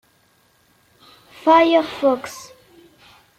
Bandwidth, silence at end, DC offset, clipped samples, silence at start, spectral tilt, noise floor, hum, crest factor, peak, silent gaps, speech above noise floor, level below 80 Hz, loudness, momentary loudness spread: 15.5 kHz; 0.95 s; under 0.1%; under 0.1%; 1.45 s; -3.5 dB/octave; -59 dBFS; none; 18 dB; -2 dBFS; none; 43 dB; -60 dBFS; -17 LUFS; 19 LU